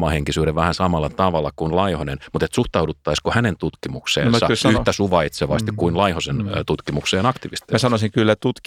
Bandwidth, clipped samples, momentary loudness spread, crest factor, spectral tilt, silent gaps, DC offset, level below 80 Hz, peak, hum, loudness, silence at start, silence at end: 15.5 kHz; under 0.1%; 6 LU; 18 dB; -5.5 dB/octave; none; under 0.1%; -38 dBFS; -2 dBFS; none; -20 LUFS; 0 s; 0.1 s